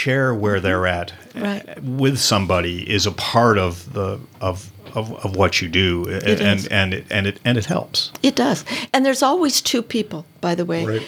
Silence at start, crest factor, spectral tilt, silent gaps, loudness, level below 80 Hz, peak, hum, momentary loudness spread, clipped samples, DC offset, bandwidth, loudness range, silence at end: 0 s; 18 dB; -4.5 dB/octave; none; -19 LUFS; -56 dBFS; 0 dBFS; none; 10 LU; under 0.1%; under 0.1%; 18.5 kHz; 2 LU; 0 s